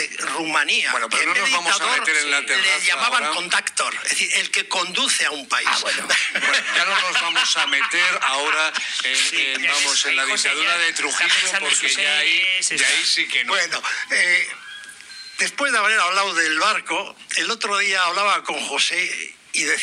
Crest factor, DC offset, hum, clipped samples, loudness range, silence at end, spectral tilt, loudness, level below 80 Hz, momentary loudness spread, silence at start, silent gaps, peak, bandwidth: 14 dB; under 0.1%; none; under 0.1%; 3 LU; 0 s; 1.5 dB/octave; -18 LUFS; -78 dBFS; 6 LU; 0 s; none; -6 dBFS; 14 kHz